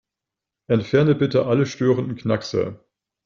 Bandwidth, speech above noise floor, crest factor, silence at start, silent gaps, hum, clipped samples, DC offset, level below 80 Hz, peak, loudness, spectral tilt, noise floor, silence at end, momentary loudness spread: 7.4 kHz; 66 dB; 18 dB; 0.7 s; none; none; under 0.1%; under 0.1%; -56 dBFS; -4 dBFS; -21 LUFS; -7 dB/octave; -86 dBFS; 0.5 s; 7 LU